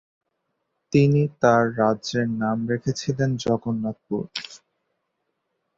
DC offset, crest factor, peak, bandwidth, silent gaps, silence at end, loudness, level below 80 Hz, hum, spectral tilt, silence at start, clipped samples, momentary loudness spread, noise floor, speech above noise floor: under 0.1%; 20 dB; -4 dBFS; 7.8 kHz; none; 1.2 s; -23 LUFS; -58 dBFS; none; -6.5 dB/octave; 0.9 s; under 0.1%; 11 LU; -77 dBFS; 55 dB